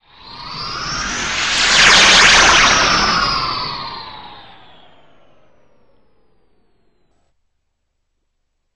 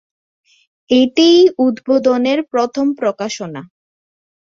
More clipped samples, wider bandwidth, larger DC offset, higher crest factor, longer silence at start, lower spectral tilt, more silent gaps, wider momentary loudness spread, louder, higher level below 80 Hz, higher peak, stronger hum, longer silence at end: neither; first, 13.5 kHz vs 7.6 kHz; first, 0.5% vs under 0.1%; about the same, 18 dB vs 14 dB; second, 0.25 s vs 0.9 s; second, -0.5 dB/octave vs -4.5 dB/octave; neither; first, 22 LU vs 14 LU; first, -11 LUFS vs -14 LUFS; first, -38 dBFS vs -60 dBFS; about the same, 0 dBFS vs 0 dBFS; neither; first, 4.35 s vs 0.75 s